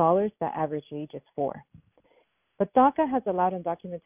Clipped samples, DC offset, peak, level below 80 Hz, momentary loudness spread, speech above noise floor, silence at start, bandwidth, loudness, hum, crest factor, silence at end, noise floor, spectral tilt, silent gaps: under 0.1%; under 0.1%; -8 dBFS; -64 dBFS; 16 LU; 40 dB; 0 s; 3.7 kHz; -27 LUFS; none; 20 dB; 0.05 s; -67 dBFS; -11 dB/octave; none